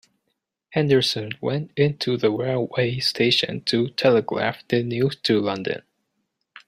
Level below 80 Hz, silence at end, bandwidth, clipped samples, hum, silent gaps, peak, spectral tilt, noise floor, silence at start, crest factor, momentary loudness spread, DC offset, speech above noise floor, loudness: -60 dBFS; 0.9 s; 15 kHz; under 0.1%; none; none; -4 dBFS; -5.5 dB/octave; -77 dBFS; 0.7 s; 18 dB; 8 LU; under 0.1%; 55 dB; -22 LUFS